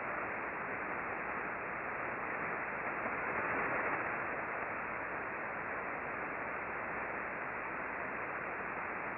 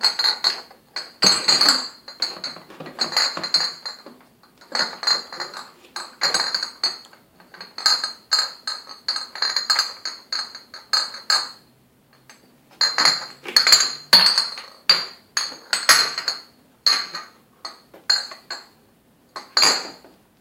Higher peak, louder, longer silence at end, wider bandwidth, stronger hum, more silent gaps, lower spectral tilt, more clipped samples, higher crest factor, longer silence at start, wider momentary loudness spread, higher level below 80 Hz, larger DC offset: second, -24 dBFS vs 0 dBFS; second, -38 LUFS vs -19 LUFS; second, 0 s vs 0.45 s; second, 5.4 kHz vs 17 kHz; neither; neither; first, -4.5 dB/octave vs 1 dB/octave; neither; second, 16 dB vs 24 dB; about the same, 0 s vs 0 s; second, 4 LU vs 20 LU; about the same, -66 dBFS vs -70 dBFS; neither